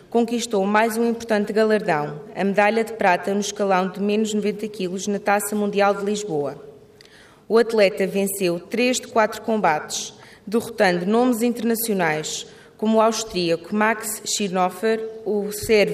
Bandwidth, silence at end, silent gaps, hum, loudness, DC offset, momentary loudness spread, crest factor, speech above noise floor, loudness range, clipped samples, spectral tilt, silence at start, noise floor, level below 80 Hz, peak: 15.5 kHz; 0 s; none; none; -21 LUFS; under 0.1%; 8 LU; 16 dB; 28 dB; 2 LU; under 0.1%; -4 dB/octave; 0.1 s; -49 dBFS; -58 dBFS; -4 dBFS